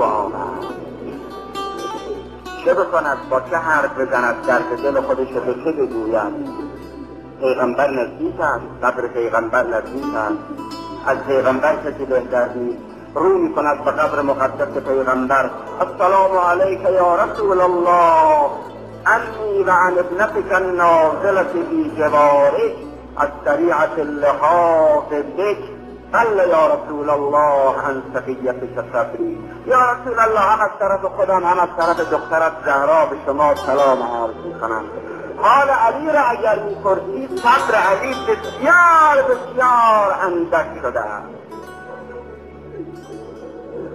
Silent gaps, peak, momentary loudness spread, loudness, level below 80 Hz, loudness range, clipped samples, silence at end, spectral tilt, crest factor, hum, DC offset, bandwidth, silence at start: none; -2 dBFS; 17 LU; -17 LUFS; -48 dBFS; 6 LU; under 0.1%; 0 s; -5.5 dB/octave; 16 dB; none; 0.1%; 15.5 kHz; 0 s